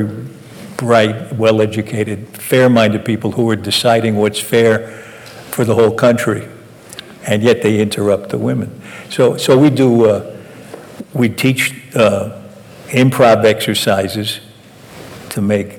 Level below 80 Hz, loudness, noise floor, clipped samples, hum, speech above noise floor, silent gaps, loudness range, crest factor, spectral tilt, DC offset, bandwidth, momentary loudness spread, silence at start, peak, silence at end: -56 dBFS; -14 LUFS; -38 dBFS; under 0.1%; none; 25 dB; none; 2 LU; 12 dB; -5.5 dB/octave; under 0.1%; 19 kHz; 22 LU; 0 s; -2 dBFS; 0 s